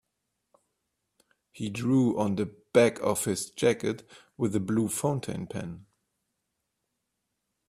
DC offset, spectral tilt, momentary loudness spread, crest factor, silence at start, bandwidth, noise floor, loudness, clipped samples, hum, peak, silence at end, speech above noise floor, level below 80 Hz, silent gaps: under 0.1%; -5.5 dB/octave; 14 LU; 22 dB; 1.55 s; 15 kHz; -82 dBFS; -28 LUFS; under 0.1%; none; -8 dBFS; 1.85 s; 54 dB; -64 dBFS; none